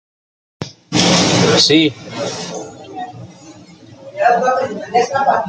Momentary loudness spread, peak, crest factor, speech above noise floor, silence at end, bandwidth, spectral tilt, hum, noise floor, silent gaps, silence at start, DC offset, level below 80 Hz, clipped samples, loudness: 21 LU; 0 dBFS; 16 dB; 25 dB; 0 s; 9.4 kHz; -3.5 dB/octave; none; -40 dBFS; none; 0.6 s; under 0.1%; -54 dBFS; under 0.1%; -14 LUFS